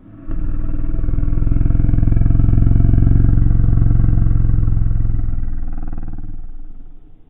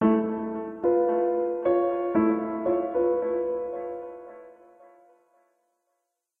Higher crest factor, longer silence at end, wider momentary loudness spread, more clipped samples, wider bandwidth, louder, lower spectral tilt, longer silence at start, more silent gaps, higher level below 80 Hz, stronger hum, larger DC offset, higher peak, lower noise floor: about the same, 12 dB vs 16 dB; second, 0.3 s vs 1.9 s; first, 16 LU vs 12 LU; neither; second, 2.3 kHz vs 3.6 kHz; first, -18 LUFS vs -26 LUFS; first, -14 dB/octave vs -10.5 dB/octave; first, 0.15 s vs 0 s; neither; first, -16 dBFS vs -64 dBFS; neither; neither; first, -2 dBFS vs -10 dBFS; second, -33 dBFS vs -80 dBFS